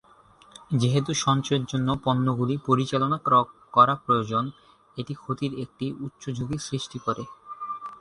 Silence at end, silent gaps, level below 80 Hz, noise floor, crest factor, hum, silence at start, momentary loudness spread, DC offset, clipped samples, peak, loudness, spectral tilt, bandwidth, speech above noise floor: 0.05 s; none; -58 dBFS; -55 dBFS; 22 dB; none; 0.7 s; 15 LU; under 0.1%; under 0.1%; -4 dBFS; -25 LUFS; -6 dB/octave; 11 kHz; 30 dB